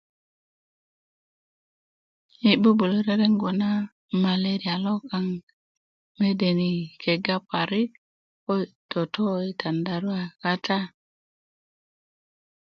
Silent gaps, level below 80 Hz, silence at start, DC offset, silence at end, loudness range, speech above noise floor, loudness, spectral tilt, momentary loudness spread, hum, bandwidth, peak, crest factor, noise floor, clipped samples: 3.92-4.09 s, 5.43-5.47 s, 5.53-6.15 s, 7.98-8.47 s, 8.75-8.89 s; -68 dBFS; 2.4 s; under 0.1%; 1.8 s; 5 LU; over 66 dB; -25 LUFS; -7.5 dB/octave; 8 LU; none; 6.6 kHz; -4 dBFS; 22 dB; under -90 dBFS; under 0.1%